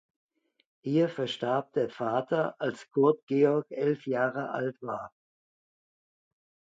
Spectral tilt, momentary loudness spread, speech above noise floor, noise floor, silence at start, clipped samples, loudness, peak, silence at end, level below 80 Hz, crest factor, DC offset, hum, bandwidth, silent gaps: -7 dB/octave; 11 LU; over 62 dB; under -90 dBFS; 0.85 s; under 0.1%; -29 LUFS; -12 dBFS; 1.65 s; -78 dBFS; 20 dB; under 0.1%; none; 7.8 kHz; 3.23-3.27 s